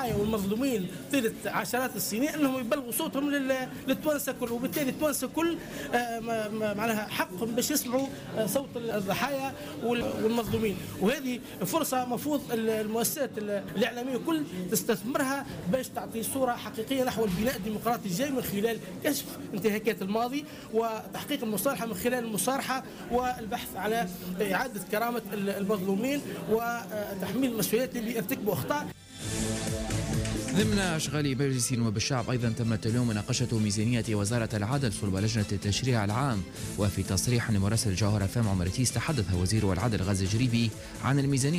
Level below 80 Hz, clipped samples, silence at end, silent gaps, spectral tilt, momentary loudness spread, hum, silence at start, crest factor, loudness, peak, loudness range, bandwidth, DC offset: -52 dBFS; under 0.1%; 0 s; none; -5 dB/octave; 5 LU; none; 0 s; 14 dB; -30 LUFS; -16 dBFS; 3 LU; 16 kHz; under 0.1%